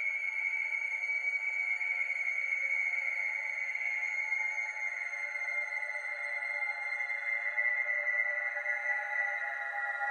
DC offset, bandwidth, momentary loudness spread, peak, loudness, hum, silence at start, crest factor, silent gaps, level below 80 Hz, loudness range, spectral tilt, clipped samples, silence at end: under 0.1%; 11.5 kHz; 5 LU; -20 dBFS; -32 LUFS; none; 0 s; 14 dB; none; -88 dBFS; 2 LU; 1.5 dB/octave; under 0.1%; 0 s